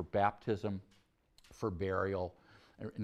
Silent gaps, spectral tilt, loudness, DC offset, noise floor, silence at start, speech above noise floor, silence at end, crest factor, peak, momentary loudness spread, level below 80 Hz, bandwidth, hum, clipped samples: none; -7.5 dB/octave; -38 LUFS; under 0.1%; -67 dBFS; 0 s; 31 dB; 0 s; 22 dB; -16 dBFS; 13 LU; -62 dBFS; 12.5 kHz; none; under 0.1%